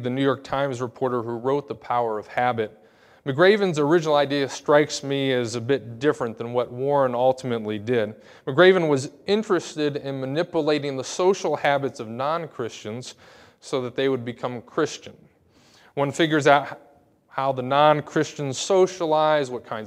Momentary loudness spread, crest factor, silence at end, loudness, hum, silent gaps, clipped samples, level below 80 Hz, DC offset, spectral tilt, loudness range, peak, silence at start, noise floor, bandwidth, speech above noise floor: 12 LU; 22 dB; 0 s; -23 LUFS; none; none; under 0.1%; -68 dBFS; under 0.1%; -5 dB/octave; 6 LU; -2 dBFS; 0 s; -57 dBFS; 12.5 kHz; 34 dB